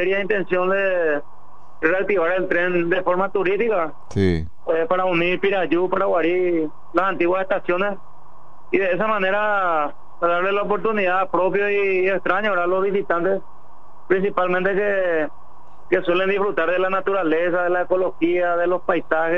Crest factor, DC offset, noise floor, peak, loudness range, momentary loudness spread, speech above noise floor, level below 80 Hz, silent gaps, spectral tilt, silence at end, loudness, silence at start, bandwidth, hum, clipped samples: 16 dB; 4%; -48 dBFS; -4 dBFS; 2 LU; 4 LU; 28 dB; -50 dBFS; none; -7.5 dB/octave; 0 s; -20 LUFS; 0 s; 6.8 kHz; none; under 0.1%